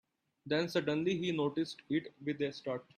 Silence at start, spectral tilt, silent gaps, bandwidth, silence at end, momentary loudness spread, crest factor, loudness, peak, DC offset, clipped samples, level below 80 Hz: 0.45 s; -6 dB/octave; none; 13.5 kHz; 0.15 s; 5 LU; 16 dB; -36 LUFS; -20 dBFS; under 0.1%; under 0.1%; -74 dBFS